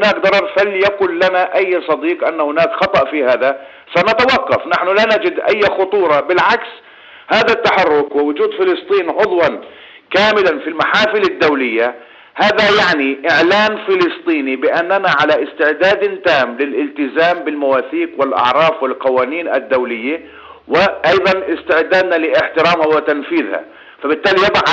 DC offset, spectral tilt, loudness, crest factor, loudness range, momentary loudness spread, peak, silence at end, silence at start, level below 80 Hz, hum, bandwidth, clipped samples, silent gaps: under 0.1%; -5 dB/octave; -14 LUFS; 12 dB; 2 LU; 6 LU; -2 dBFS; 0 s; 0 s; -52 dBFS; none; 8 kHz; under 0.1%; none